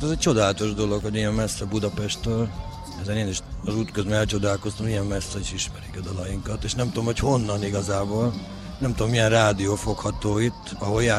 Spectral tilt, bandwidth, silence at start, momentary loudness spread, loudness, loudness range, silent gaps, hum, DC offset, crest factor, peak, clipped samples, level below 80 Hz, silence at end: -5 dB/octave; 13 kHz; 0 s; 10 LU; -25 LUFS; 3 LU; none; none; under 0.1%; 18 dB; -6 dBFS; under 0.1%; -38 dBFS; 0 s